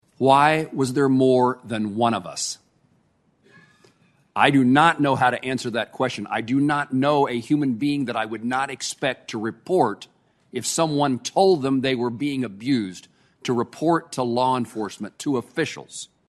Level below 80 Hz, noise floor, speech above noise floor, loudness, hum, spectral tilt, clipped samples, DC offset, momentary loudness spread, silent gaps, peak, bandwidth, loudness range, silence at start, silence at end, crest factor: -64 dBFS; -64 dBFS; 42 dB; -22 LUFS; none; -5 dB/octave; under 0.1%; under 0.1%; 12 LU; none; 0 dBFS; 12.5 kHz; 4 LU; 0.2 s; 0.25 s; 22 dB